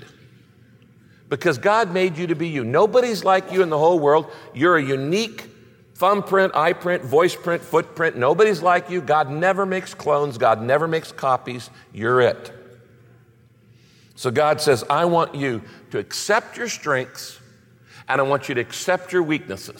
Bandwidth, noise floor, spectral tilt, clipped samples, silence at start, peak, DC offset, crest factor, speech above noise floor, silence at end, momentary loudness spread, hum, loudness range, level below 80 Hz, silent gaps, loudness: 17 kHz; -53 dBFS; -5 dB/octave; under 0.1%; 1.3 s; -6 dBFS; under 0.1%; 16 dB; 33 dB; 0 s; 11 LU; none; 5 LU; -66 dBFS; none; -20 LUFS